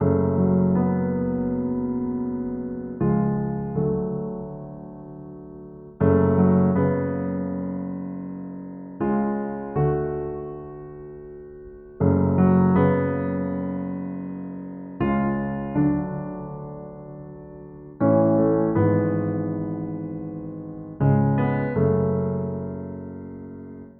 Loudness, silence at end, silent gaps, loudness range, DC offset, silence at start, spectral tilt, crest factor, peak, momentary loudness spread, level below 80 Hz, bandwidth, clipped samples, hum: -23 LUFS; 0.1 s; none; 5 LU; under 0.1%; 0 s; -10.5 dB/octave; 18 dB; -6 dBFS; 20 LU; -48 dBFS; 3.2 kHz; under 0.1%; none